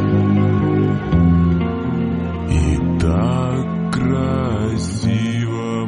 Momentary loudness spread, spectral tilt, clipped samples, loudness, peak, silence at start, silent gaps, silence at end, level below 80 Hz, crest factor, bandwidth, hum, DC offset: 6 LU; -7.5 dB/octave; under 0.1%; -18 LUFS; -4 dBFS; 0 s; none; 0 s; -30 dBFS; 14 dB; 11 kHz; none; under 0.1%